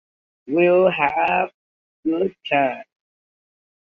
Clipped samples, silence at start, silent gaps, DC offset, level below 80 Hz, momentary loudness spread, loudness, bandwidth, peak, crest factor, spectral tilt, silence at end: under 0.1%; 0.45 s; 1.54-2.03 s; under 0.1%; -62 dBFS; 11 LU; -20 LUFS; 5 kHz; -4 dBFS; 18 dB; -8 dB/octave; 1.1 s